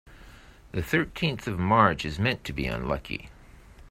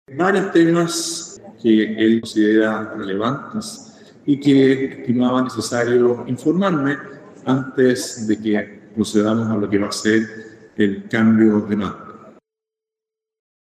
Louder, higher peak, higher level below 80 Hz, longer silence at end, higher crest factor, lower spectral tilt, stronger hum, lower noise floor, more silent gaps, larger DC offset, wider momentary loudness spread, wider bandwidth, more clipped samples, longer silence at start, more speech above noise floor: second, -27 LUFS vs -18 LUFS; about the same, -6 dBFS vs -4 dBFS; first, -44 dBFS vs -62 dBFS; second, 0 s vs 1.4 s; first, 24 dB vs 16 dB; about the same, -6 dB/octave vs -5.5 dB/octave; neither; second, -50 dBFS vs -87 dBFS; neither; neither; about the same, 14 LU vs 13 LU; first, 16 kHz vs 14.5 kHz; neither; about the same, 0.05 s vs 0.1 s; second, 23 dB vs 69 dB